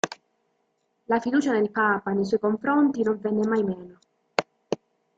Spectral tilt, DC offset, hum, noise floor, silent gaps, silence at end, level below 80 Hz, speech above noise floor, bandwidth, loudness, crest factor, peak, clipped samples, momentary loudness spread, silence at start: -5.5 dB/octave; under 0.1%; none; -73 dBFS; none; 0.45 s; -68 dBFS; 49 dB; 8.6 kHz; -25 LUFS; 24 dB; -2 dBFS; under 0.1%; 12 LU; 0.05 s